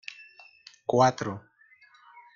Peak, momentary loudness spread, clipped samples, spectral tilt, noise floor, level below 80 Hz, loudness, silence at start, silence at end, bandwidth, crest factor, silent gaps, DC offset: -8 dBFS; 20 LU; under 0.1%; -5.5 dB/octave; -59 dBFS; -70 dBFS; -26 LUFS; 0.1 s; 0.15 s; 7.4 kHz; 22 dB; none; under 0.1%